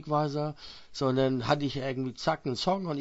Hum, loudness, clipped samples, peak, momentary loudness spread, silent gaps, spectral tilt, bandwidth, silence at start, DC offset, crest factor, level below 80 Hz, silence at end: none; -30 LUFS; under 0.1%; -12 dBFS; 8 LU; none; -6 dB/octave; 8 kHz; 0 s; under 0.1%; 18 dB; -58 dBFS; 0 s